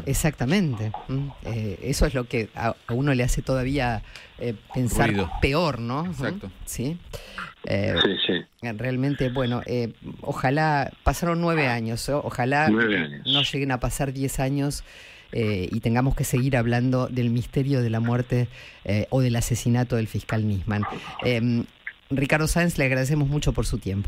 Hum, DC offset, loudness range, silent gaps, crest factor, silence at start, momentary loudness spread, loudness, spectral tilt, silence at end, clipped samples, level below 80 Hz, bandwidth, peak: none; under 0.1%; 3 LU; none; 18 dB; 0 s; 10 LU; -25 LUFS; -5.5 dB/octave; 0 s; under 0.1%; -38 dBFS; 16 kHz; -6 dBFS